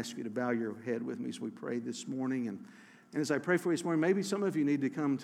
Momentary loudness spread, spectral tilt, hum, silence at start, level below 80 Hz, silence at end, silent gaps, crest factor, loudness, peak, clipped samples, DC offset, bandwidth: 10 LU; -5.5 dB/octave; none; 0 s; -90 dBFS; 0 s; none; 16 dB; -34 LUFS; -16 dBFS; under 0.1%; under 0.1%; 15 kHz